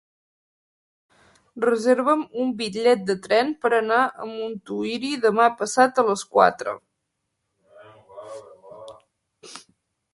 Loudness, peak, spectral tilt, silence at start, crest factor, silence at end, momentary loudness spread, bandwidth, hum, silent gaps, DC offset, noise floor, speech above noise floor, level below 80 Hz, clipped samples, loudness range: -22 LUFS; 0 dBFS; -4 dB/octave; 1.55 s; 24 dB; 0.55 s; 23 LU; 11.5 kHz; none; none; under 0.1%; -78 dBFS; 57 dB; -70 dBFS; under 0.1%; 5 LU